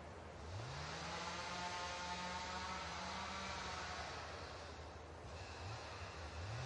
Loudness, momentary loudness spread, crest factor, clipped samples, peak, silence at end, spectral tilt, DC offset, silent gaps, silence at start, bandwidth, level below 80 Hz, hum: -47 LUFS; 8 LU; 16 dB; under 0.1%; -32 dBFS; 0 s; -3.5 dB/octave; under 0.1%; none; 0 s; 11 kHz; -62 dBFS; none